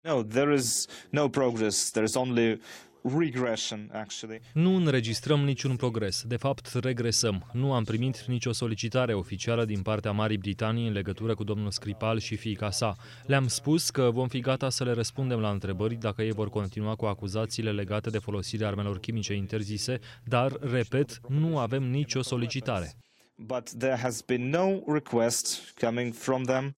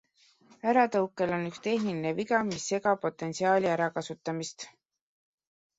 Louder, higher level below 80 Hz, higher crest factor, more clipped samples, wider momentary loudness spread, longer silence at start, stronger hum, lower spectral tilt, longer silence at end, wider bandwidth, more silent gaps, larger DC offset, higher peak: about the same, -29 LUFS vs -29 LUFS; first, -62 dBFS vs -70 dBFS; about the same, 18 dB vs 18 dB; neither; second, 7 LU vs 10 LU; second, 0.05 s vs 0.65 s; neither; about the same, -5 dB/octave vs -5 dB/octave; second, 0.05 s vs 1.1 s; first, 16 kHz vs 8 kHz; neither; neither; about the same, -12 dBFS vs -12 dBFS